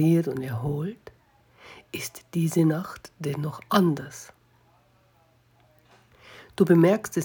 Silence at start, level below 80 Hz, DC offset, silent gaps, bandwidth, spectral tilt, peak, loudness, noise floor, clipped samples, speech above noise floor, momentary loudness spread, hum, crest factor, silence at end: 0 s; -62 dBFS; under 0.1%; none; over 20 kHz; -6.5 dB/octave; -6 dBFS; -25 LUFS; -62 dBFS; under 0.1%; 38 dB; 20 LU; none; 20 dB; 0 s